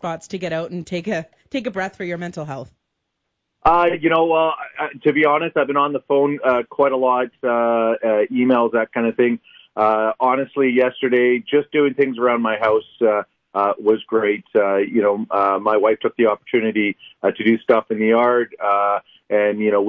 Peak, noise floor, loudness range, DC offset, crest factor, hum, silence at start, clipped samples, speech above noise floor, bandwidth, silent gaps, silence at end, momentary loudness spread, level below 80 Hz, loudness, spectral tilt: -4 dBFS; -76 dBFS; 3 LU; under 0.1%; 16 dB; none; 0.05 s; under 0.1%; 58 dB; 7.8 kHz; none; 0 s; 10 LU; -54 dBFS; -19 LUFS; -6.5 dB/octave